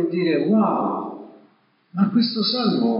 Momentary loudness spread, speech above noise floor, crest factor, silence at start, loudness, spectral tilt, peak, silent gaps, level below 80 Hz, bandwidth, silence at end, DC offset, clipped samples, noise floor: 14 LU; 39 dB; 14 dB; 0 s; -20 LUFS; -5 dB/octave; -8 dBFS; none; under -90 dBFS; 5.4 kHz; 0 s; under 0.1%; under 0.1%; -59 dBFS